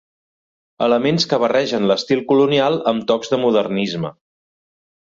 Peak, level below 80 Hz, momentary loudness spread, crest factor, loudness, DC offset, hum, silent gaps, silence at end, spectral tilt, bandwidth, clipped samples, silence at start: -4 dBFS; -60 dBFS; 6 LU; 16 dB; -17 LUFS; under 0.1%; none; none; 1 s; -5.5 dB/octave; 7.6 kHz; under 0.1%; 0.8 s